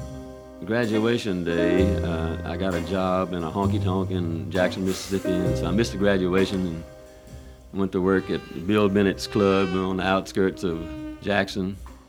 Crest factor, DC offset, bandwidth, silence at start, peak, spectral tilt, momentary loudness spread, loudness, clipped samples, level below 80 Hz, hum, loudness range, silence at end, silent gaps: 18 dB; under 0.1%; 19 kHz; 0 s; -6 dBFS; -6.5 dB/octave; 13 LU; -24 LUFS; under 0.1%; -42 dBFS; none; 2 LU; 0.1 s; none